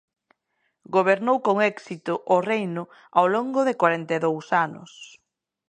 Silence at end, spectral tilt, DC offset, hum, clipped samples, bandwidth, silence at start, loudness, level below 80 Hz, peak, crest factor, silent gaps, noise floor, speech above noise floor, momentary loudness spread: 0.6 s; -6 dB/octave; under 0.1%; none; under 0.1%; 9.6 kHz; 0.9 s; -23 LUFS; -76 dBFS; -4 dBFS; 20 dB; none; -74 dBFS; 51 dB; 12 LU